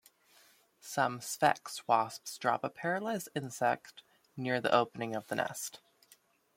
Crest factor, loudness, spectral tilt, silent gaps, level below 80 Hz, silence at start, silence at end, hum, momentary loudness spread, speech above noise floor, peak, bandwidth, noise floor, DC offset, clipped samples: 24 dB; -34 LUFS; -4 dB/octave; none; -80 dBFS; 0.85 s; 0.8 s; none; 11 LU; 33 dB; -12 dBFS; 16.5 kHz; -66 dBFS; under 0.1%; under 0.1%